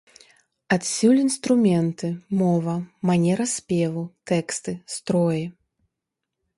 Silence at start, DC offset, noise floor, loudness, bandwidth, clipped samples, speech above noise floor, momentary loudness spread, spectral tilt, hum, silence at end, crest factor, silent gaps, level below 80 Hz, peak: 0.7 s; under 0.1%; -83 dBFS; -23 LUFS; 11.5 kHz; under 0.1%; 61 dB; 11 LU; -5.5 dB/octave; none; 1.05 s; 16 dB; none; -62 dBFS; -6 dBFS